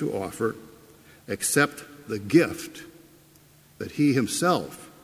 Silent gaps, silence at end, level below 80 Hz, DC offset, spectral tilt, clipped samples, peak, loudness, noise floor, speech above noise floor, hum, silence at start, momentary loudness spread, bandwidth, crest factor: none; 0.15 s; -60 dBFS; under 0.1%; -4.5 dB/octave; under 0.1%; -6 dBFS; -25 LUFS; -55 dBFS; 30 dB; none; 0 s; 18 LU; 16 kHz; 22 dB